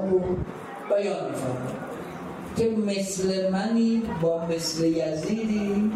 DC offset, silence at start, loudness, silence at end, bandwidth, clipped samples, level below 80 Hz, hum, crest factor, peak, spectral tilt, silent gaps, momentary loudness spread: under 0.1%; 0 s; -26 LUFS; 0 s; 13.5 kHz; under 0.1%; -52 dBFS; none; 14 dB; -12 dBFS; -5.5 dB/octave; none; 11 LU